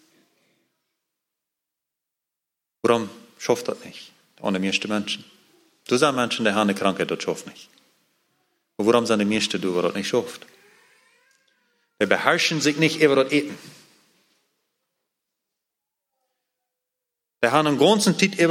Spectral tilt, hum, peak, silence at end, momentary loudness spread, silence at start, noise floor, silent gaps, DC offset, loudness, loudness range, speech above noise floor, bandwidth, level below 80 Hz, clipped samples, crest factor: -4 dB/octave; none; -2 dBFS; 0 s; 16 LU; 2.85 s; -85 dBFS; none; under 0.1%; -22 LUFS; 7 LU; 64 dB; 16.5 kHz; -70 dBFS; under 0.1%; 24 dB